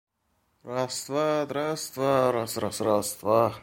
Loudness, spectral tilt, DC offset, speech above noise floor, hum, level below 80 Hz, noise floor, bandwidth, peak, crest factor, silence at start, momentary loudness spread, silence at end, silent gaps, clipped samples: -27 LUFS; -4.5 dB/octave; under 0.1%; 46 dB; none; -64 dBFS; -72 dBFS; 16.5 kHz; -8 dBFS; 20 dB; 0.65 s; 7 LU; 0 s; none; under 0.1%